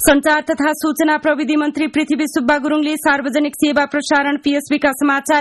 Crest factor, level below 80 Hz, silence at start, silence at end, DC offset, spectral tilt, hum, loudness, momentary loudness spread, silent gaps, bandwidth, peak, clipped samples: 14 dB; -46 dBFS; 0 s; 0 s; under 0.1%; -2.5 dB/octave; none; -16 LUFS; 3 LU; none; 12.5 kHz; 0 dBFS; under 0.1%